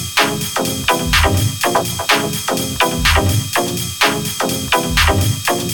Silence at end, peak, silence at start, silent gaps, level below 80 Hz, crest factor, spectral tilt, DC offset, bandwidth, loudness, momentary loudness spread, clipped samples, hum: 0 s; 0 dBFS; 0 s; none; -28 dBFS; 16 dB; -3.5 dB/octave; under 0.1%; 19.5 kHz; -15 LUFS; 5 LU; under 0.1%; none